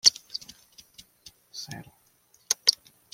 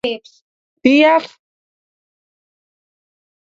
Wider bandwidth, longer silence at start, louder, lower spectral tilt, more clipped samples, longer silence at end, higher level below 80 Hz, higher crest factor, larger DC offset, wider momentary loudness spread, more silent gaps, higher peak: first, 16.5 kHz vs 7.8 kHz; about the same, 0.05 s vs 0.05 s; second, -26 LUFS vs -14 LUFS; second, 1 dB/octave vs -4.5 dB/octave; neither; second, 0.4 s vs 2.2 s; second, -70 dBFS vs -62 dBFS; first, 30 dB vs 20 dB; neither; first, 22 LU vs 19 LU; second, none vs 0.42-0.77 s; about the same, -2 dBFS vs 0 dBFS